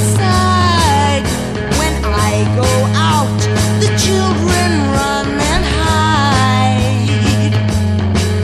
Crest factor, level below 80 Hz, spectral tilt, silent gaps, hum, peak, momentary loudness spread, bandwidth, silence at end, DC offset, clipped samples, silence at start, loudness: 12 dB; -26 dBFS; -5 dB/octave; none; none; 0 dBFS; 4 LU; 13.5 kHz; 0 s; under 0.1%; under 0.1%; 0 s; -13 LUFS